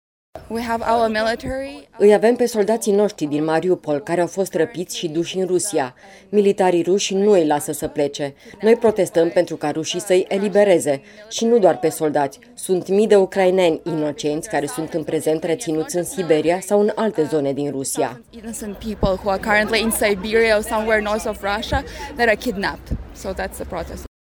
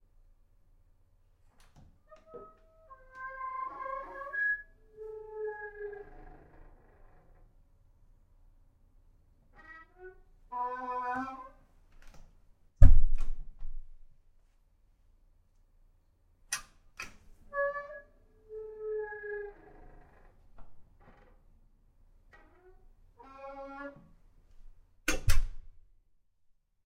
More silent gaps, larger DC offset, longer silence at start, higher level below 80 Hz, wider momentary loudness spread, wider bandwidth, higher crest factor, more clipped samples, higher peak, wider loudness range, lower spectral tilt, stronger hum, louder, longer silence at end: neither; neither; second, 0.35 s vs 2.35 s; second, -42 dBFS vs -36 dBFS; second, 13 LU vs 24 LU; first, 19.5 kHz vs 14 kHz; second, 18 dB vs 28 dB; neither; first, 0 dBFS vs -4 dBFS; second, 3 LU vs 18 LU; about the same, -4.5 dB/octave vs -5 dB/octave; neither; first, -19 LUFS vs -36 LUFS; second, 0.3 s vs 1.25 s